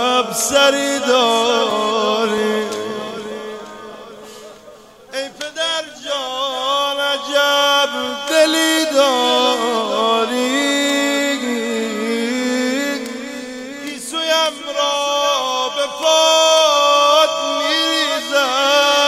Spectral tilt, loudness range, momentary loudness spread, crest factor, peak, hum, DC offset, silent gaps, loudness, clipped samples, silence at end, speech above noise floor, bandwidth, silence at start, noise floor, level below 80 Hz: -1 dB/octave; 10 LU; 16 LU; 16 dB; 0 dBFS; none; under 0.1%; none; -16 LUFS; under 0.1%; 0 s; 26 dB; 16 kHz; 0 s; -42 dBFS; -62 dBFS